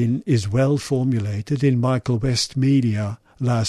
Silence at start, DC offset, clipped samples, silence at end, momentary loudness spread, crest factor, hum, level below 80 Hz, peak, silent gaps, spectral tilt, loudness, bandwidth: 0 s; under 0.1%; under 0.1%; 0 s; 6 LU; 12 dB; none; -48 dBFS; -8 dBFS; none; -6.5 dB/octave; -21 LUFS; 12 kHz